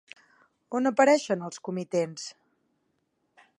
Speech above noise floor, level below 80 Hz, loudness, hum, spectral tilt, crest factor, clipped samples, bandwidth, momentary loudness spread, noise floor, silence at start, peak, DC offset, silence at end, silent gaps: 49 dB; -84 dBFS; -26 LUFS; none; -5 dB/octave; 22 dB; under 0.1%; 11 kHz; 14 LU; -75 dBFS; 0.7 s; -8 dBFS; under 0.1%; 1.3 s; none